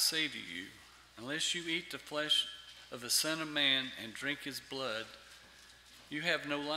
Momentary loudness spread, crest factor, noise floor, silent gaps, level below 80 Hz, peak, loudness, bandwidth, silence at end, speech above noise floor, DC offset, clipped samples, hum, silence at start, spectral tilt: 18 LU; 22 dB; -59 dBFS; none; -72 dBFS; -16 dBFS; -34 LUFS; 16 kHz; 0 s; 22 dB; under 0.1%; under 0.1%; none; 0 s; -1.5 dB/octave